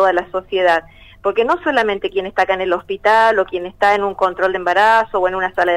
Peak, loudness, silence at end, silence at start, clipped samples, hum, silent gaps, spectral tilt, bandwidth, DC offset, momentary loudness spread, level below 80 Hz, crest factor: 0 dBFS; -16 LUFS; 0 s; 0 s; under 0.1%; none; none; -4.5 dB/octave; 14 kHz; under 0.1%; 8 LU; -48 dBFS; 16 dB